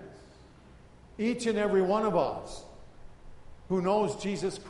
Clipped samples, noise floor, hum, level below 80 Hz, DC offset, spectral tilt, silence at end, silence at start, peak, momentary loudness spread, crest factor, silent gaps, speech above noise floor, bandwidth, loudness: under 0.1%; -54 dBFS; none; -54 dBFS; under 0.1%; -6 dB/octave; 0 s; 0 s; -14 dBFS; 19 LU; 18 dB; none; 25 dB; 11.5 kHz; -29 LUFS